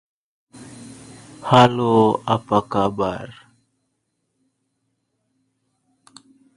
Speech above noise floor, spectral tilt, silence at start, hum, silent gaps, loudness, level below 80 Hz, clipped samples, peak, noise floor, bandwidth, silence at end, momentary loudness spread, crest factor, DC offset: 56 dB; -6.5 dB/octave; 0.55 s; none; none; -18 LUFS; -56 dBFS; under 0.1%; 0 dBFS; -73 dBFS; 11.5 kHz; 3.25 s; 26 LU; 22 dB; under 0.1%